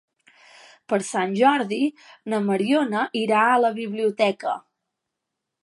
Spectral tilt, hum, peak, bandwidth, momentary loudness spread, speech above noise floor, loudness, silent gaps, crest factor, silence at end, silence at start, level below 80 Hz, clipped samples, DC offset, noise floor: -5 dB/octave; none; -6 dBFS; 11.5 kHz; 9 LU; 61 dB; -22 LUFS; none; 18 dB; 1.05 s; 0.9 s; -78 dBFS; under 0.1%; under 0.1%; -83 dBFS